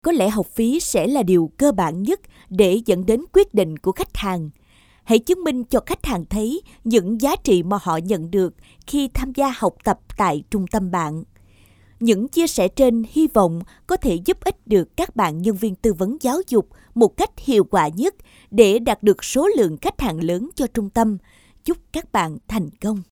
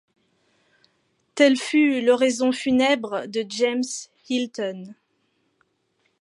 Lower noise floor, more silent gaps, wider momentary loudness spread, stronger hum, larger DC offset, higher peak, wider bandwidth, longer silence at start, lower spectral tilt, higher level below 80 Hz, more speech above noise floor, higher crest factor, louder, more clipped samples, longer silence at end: second, -52 dBFS vs -70 dBFS; neither; second, 8 LU vs 13 LU; neither; neither; first, 0 dBFS vs -4 dBFS; first, over 20 kHz vs 11.5 kHz; second, 0.05 s vs 1.35 s; first, -5.5 dB/octave vs -3 dB/octave; first, -40 dBFS vs -68 dBFS; second, 33 dB vs 48 dB; about the same, 20 dB vs 18 dB; about the same, -20 LUFS vs -22 LUFS; neither; second, 0.1 s vs 1.3 s